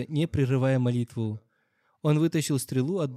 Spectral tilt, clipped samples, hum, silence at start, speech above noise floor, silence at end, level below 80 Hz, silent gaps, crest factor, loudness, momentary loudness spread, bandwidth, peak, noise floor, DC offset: -6.5 dB/octave; under 0.1%; none; 0 s; 45 dB; 0 s; -60 dBFS; none; 14 dB; -27 LUFS; 8 LU; 14.5 kHz; -12 dBFS; -71 dBFS; under 0.1%